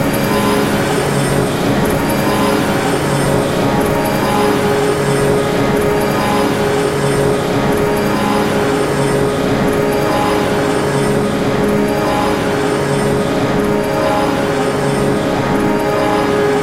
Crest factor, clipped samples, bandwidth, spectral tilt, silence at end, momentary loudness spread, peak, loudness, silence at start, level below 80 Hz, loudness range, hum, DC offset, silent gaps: 14 dB; under 0.1%; 16 kHz; -5.5 dB/octave; 0 s; 1 LU; 0 dBFS; -14 LUFS; 0 s; -34 dBFS; 1 LU; none; under 0.1%; none